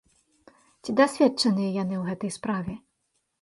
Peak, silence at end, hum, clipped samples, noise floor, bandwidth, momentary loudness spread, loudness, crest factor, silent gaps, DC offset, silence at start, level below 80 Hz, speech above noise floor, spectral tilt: -8 dBFS; 0.65 s; none; under 0.1%; -76 dBFS; 11.5 kHz; 15 LU; -25 LUFS; 20 dB; none; under 0.1%; 0.85 s; -62 dBFS; 51 dB; -5.5 dB/octave